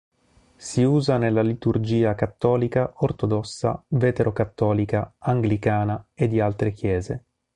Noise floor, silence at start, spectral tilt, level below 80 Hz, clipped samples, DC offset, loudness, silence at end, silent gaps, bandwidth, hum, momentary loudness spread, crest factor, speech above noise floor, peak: -58 dBFS; 0.6 s; -7.5 dB/octave; -46 dBFS; under 0.1%; under 0.1%; -23 LUFS; 0.35 s; none; 10.5 kHz; none; 6 LU; 16 dB; 36 dB; -6 dBFS